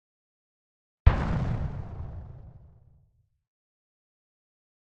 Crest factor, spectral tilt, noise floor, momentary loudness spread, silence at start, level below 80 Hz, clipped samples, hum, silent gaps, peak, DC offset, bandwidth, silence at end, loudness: 30 dB; -8.5 dB/octave; -67 dBFS; 20 LU; 1.05 s; -34 dBFS; under 0.1%; none; none; -2 dBFS; under 0.1%; 6.8 kHz; 2.5 s; -29 LUFS